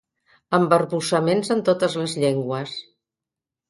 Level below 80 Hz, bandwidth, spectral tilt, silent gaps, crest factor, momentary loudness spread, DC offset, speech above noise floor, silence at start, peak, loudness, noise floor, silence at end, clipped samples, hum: -66 dBFS; 11.5 kHz; -5.5 dB/octave; none; 20 dB; 10 LU; under 0.1%; 67 dB; 0.5 s; -4 dBFS; -21 LUFS; -88 dBFS; 0.85 s; under 0.1%; none